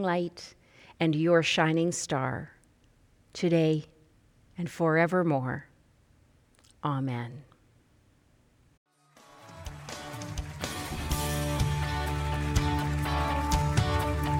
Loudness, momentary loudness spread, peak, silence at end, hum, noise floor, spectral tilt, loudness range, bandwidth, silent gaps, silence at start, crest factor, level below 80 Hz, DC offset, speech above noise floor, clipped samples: -29 LUFS; 17 LU; -10 dBFS; 0 s; none; -64 dBFS; -5.5 dB/octave; 12 LU; 17 kHz; 8.77-8.86 s; 0 s; 20 dB; -40 dBFS; under 0.1%; 37 dB; under 0.1%